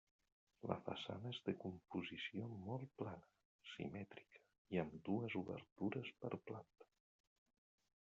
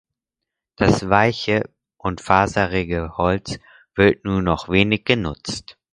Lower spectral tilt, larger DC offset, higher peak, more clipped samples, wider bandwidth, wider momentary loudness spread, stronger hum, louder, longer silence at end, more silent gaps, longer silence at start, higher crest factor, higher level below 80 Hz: about the same, -5 dB/octave vs -5.5 dB/octave; neither; second, -24 dBFS vs 0 dBFS; neither; second, 7.4 kHz vs 11 kHz; about the same, 11 LU vs 13 LU; neither; second, -49 LUFS vs -20 LUFS; first, 1.2 s vs 0.25 s; first, 3.45-3.59 s, 4.58-4.65 s, 5.72-5.76 s vs none; second, 0.65 s vs 0.8 s; first, 26 dB vs 20 dB; second, -82 dBFS vs -40 dBFS